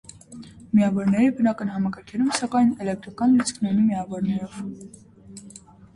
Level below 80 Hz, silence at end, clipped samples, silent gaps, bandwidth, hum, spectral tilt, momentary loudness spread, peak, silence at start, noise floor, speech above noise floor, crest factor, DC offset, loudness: -58 dBFS; 0.35 s; under 0.1%; none; 11.5 kHz; none; -6 dB/octave; 22 LU; -6 dBFS; 0.3 s; -46 dBFS; 24 dB; 18 dB; under 0.1%; -23 LUFS